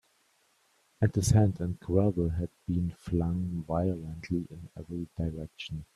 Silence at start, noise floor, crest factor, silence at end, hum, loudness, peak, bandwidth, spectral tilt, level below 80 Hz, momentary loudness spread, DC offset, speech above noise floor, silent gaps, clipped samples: 1 s; -69 dBFS; 20 dB; 0.1 s; none; -31 LUFS; -12 dBFS; 13 kHz; -7 dB/octave; -48 dBFS; 15 LU; under 0.1%; 40 dB; none; under 0.1%